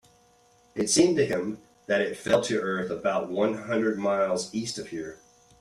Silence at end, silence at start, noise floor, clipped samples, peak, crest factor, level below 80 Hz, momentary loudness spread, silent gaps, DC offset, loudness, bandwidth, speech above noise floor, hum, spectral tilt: 0.45 s; 0.75 s; -61 dBFS; under 0.1%; -8 dBFS; 18 dB; -64 dBFS; 14 LU; none; under 0.1%; -26 LUFS; 14 kHz; 35 dB; none; -4 dB/octave